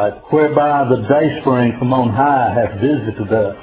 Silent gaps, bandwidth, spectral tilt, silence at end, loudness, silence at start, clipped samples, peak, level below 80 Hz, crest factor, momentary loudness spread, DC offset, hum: none; 4 kHz; -11.5 dB/octave; 0 s; -15 LUFS; 0 s; under 0.1%; 0 dBFS; -44 dBFS; 14 dB; 4 LU; under 0.1%; none